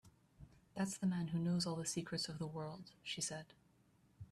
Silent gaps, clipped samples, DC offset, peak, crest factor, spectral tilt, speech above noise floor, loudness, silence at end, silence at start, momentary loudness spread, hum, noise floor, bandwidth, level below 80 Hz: none; under 0.1%; under 0.1%; -28 dBFS; 16 dB; -4.5 dB/octave; 31 dB; -42 LUFS; 0.1 s; 0.05 s; 13 LU; none; -72 dBFS; 13.5 kHz; -72 dBFS